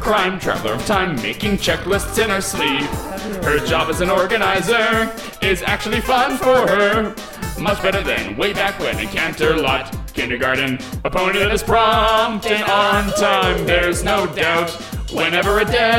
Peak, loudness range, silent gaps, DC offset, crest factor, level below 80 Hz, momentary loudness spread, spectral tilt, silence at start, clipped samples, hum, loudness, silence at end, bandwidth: -2 dBFS; 3 LU; none; under 0.1%; 16 dB; -32 dBFS; 7 LU; -4 dB/octave; 0 s; under 0.1%; none; -17 LUFS; 0 s; 17 kHz